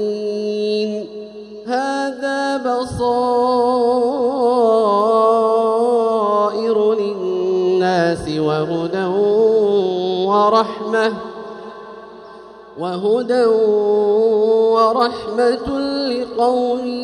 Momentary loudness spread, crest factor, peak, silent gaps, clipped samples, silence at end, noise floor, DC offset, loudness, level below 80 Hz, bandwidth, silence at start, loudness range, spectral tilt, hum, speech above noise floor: 11 LU; 14 dB; -2 dBFS; none; under 0.1%; 0 s; -38 dBFS; under 0.1%; -17 LUFS; -52 dBFS; 10.5 kHz; 0 s; 5 LU; -6 dB/octave; none; 22 dB